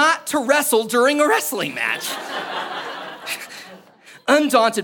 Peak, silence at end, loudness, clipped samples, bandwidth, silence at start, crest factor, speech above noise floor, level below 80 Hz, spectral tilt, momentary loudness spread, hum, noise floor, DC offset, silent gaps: 0 dBFS; 0 s; -19 LUFS; under 0.1%; 17.5 kHz; 0 s; 20 dB; 29 dB; -74 dBFS; -2 dB/octave; 13 LU; none; -47 dBFS; under 0.1%; none